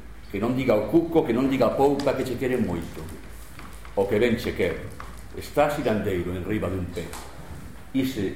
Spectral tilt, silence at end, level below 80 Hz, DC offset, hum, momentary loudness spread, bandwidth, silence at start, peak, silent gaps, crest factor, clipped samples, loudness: -6.5 dB/octave; 0 s; -44 dBFS; 0.8%; none; 20 LU; 16.5 kHz; 0 s; -6 dBFS; none; 18 dB; under 0.1%; -25 LUFS